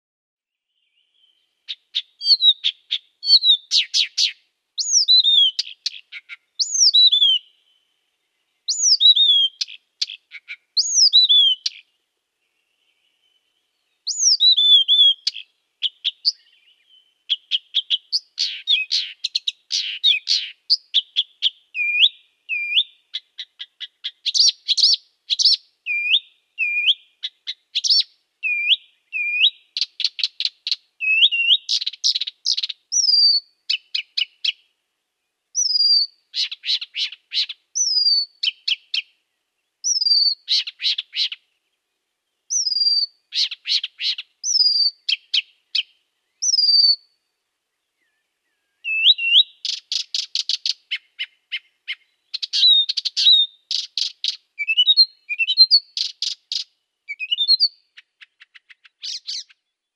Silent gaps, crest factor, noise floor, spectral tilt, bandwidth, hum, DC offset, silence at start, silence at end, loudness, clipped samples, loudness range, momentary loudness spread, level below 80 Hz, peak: none; 18 dB; -77 dBFS; 11 dB/octave; 12.5 kHz; none; under 0.1%; 1.7 s; 0.55 s; -17 LUFS; under 0.1%; 5 LU; 17 LU; under -90 dBFS; -2 dBFS